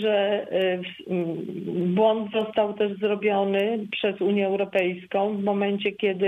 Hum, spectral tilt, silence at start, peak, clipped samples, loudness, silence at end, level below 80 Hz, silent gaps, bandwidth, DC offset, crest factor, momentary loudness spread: none; -8 dB/octave; 0 s; -8 dBFS; under 0.1%; -25 LUFS; 0 s; -72 dBFS; none; 4 kHz; under 0.1%; 16 dB; 6 LU